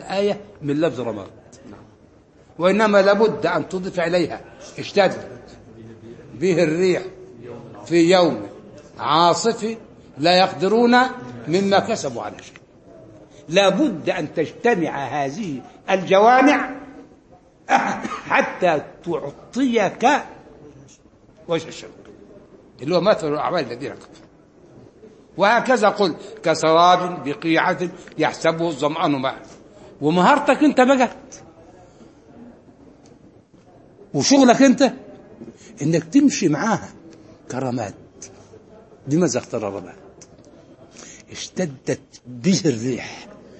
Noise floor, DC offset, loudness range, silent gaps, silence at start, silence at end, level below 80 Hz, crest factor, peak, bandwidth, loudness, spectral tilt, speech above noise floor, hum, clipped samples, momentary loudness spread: -51 dBFS; under 0.1%; 7 LU; none; 0 s; 0.3 s; -60 dBFS; 20 dB; 0 dBFS; 8.8 kHz; -19 LUFS; -5 dB/octave; 32 dB; none; under 0.1%; 22 LU